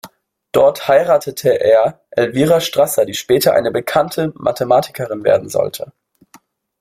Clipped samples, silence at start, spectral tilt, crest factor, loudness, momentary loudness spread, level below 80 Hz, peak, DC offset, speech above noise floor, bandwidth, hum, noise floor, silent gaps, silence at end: under 0.1%; 0.05 s; -4.5 dB/octave; 14 dB; -15 LUFS; 7 LU; -54 dBFS; 0 dBFS; under 0.1%; 35 dB; 16.5 kHz; none; -50 dBFS; none; 0.9 s